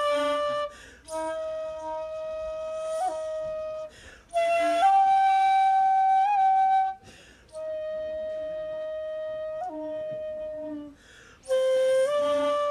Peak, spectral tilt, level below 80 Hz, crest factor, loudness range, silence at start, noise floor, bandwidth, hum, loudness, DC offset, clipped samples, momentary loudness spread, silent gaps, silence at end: -12 dBFS; -3 dB/octave; -62 dBFS; 14 dB; 11 LU; 0 s; -52 dBFS; 12.5 kHz; none; -26 LUFS; under 0.1%; under 0.1%; 15 LU; none; 0 s